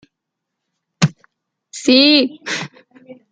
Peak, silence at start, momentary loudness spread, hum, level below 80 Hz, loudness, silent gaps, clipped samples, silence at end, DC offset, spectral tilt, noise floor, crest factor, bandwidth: 0 dBFS; 1 s; 18 LU; none; -60 dBFS; -15 LUFS; none; under 0.1%; 0.2 s; under 0.1%; -4.5 dB/octave; -79 dBFS; 18 dB; 9.4 kHz